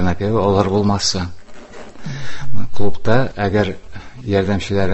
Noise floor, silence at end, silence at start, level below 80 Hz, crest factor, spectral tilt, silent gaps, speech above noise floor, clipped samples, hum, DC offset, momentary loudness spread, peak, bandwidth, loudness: -35 dBFS; 0 s; 0 s; -36 dBFS; 14 dB; -5.5 dB/octave; none; 22 dB; under 0.1%; none; under 0.1%; 18 LU; 0 dBFS; 8.4 kHz; -19 LUFS